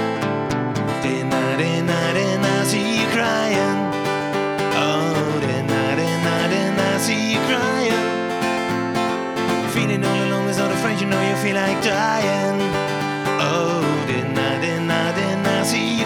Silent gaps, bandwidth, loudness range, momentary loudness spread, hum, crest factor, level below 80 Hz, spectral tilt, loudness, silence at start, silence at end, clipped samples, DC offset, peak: none; 19.5 kHz; 1 LU; 3 LU; none; 16 dB; -54 dBFS; -5 dB/octave; -20 LUFS; 0 s; 0 s; under 0.1%; under 0.1%; -4 dBFS